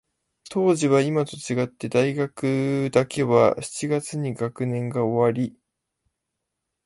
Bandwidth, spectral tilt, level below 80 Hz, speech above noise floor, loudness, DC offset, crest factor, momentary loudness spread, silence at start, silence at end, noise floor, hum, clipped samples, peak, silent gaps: 11.5 kHz; -6 dB/octave; -62 dBFS; 59 dB; -23 LUFS; under 0.1%; 20 dB; 9 LU; 0.5 s; 1.35 s; -81 dBFS; none; under 0.1%; -4 dBFS; none